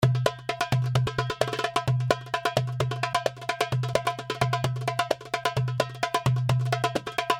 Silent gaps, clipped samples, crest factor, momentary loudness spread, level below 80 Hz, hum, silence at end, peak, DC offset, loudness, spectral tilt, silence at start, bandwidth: none; under 0.1%; 22 dB; 3 LU; -54 dBFS; none; 0 s; -4 dBFS; under 0.1%; -27 LUFS; -5 dB/octave; 0 s; 15.5 kHz